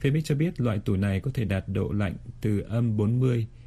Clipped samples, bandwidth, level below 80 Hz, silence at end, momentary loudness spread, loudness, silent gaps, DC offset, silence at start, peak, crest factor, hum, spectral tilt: under 0.1%; 13 kHz; -46 dBFS; 0 s; 4 LU; -27 LUFS; none; under 0.1%; 0 s; -12 dBFS; 14 dB; none; -8 dB/octave